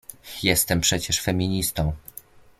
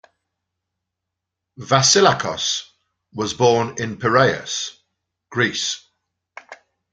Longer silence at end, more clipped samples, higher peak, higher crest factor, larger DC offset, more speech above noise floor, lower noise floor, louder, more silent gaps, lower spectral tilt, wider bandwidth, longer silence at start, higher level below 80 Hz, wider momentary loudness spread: first, 0.6 s vs 0.4 s; neither; second, -4 dBFS vs 0 dBFS; about the same, 20 dB vs 20 dB; neither; second, 24 dB vs 64 dB; second, -47 dBFS vs -82 dBFS; second, -22 LUFS vs -18 LUFS; neither; about the same, -3.5 dB/octave vs -3 dB/octave; first, 16.5 kHz vs 9.6 kHz; second, 0.1 s vs 1.6 s; first, -40 dBFS vs -58 dBFS; first, 18 LU vs 15 LU